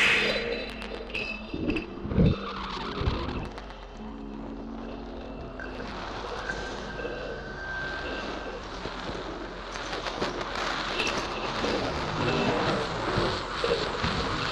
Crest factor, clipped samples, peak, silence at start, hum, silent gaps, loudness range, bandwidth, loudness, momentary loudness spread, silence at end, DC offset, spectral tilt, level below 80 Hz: 20 dB; under 0.1%; -12 dBFS; 0 s; none; none; 8 LU; 13 kHz; -31 LUFS; 13 LU; 0 s; under 0.1%; -5 dB/octave; -42 dBFS